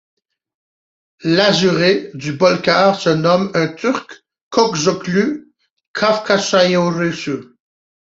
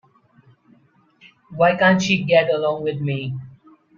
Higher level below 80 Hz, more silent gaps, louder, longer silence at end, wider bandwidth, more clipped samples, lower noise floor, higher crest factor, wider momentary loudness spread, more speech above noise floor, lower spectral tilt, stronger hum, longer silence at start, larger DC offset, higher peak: about the same, -58 dBFS vs -60 dBFS; first, 4.41-4.51 s, 5.70-5.76 s, 5.87-5.94 s vs none; first, -16 LUFS vs -19 LUFS; first, 0.7 s vs 0.45 s; about the same, 8 kHz vs 7.4 kHz; neither; first, under -90 dBFS vs -57 dBFS; about the same, 16 dB vs 18 dB; second, 11 LU vs 15 LU; first, over 75 dB vs 38 dB; about the same, -4.5 dB/octave vs -5.5 dB/octave; neither; second, 1.25 s vs 1.5 s; neither; first, 0 dBFS vs -4 dBFS